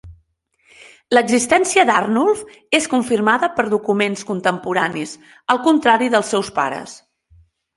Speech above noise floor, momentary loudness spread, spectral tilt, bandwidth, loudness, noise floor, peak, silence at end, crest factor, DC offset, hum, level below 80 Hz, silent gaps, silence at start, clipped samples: 45 dB; 9 LU; -3.5 dB/octave; 11.5 kHz; -17 LUFS; -62 dBFS; -2 dBFS; 0.8 s; 18 dB; under 0.1%; none; -56 dBFS; none; 0.05 s; under 0.1%